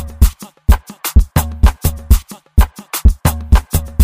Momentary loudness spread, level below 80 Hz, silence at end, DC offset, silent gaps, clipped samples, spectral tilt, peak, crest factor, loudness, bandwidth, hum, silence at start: 4 LU; -14 dBFS; 0 s; 0.3%; none; under 0.1%; -5.5 dB/octave; 0 dBFS; 12 dB; -16 LUFS; 16 kHz; none; 0 s